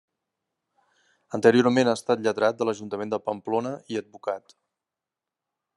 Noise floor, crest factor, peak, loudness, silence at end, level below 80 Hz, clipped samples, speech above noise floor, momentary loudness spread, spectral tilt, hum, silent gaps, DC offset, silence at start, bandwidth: -88 dBFS; 22 dB; -4 dBFS; -25 LUFS; 1.4 s; -76 dBFS; under 0.1%; 64 dB; 13 LU; -5.5 dB/octave; none; none; under 0.1%; 1.3 s; 11.5 kHz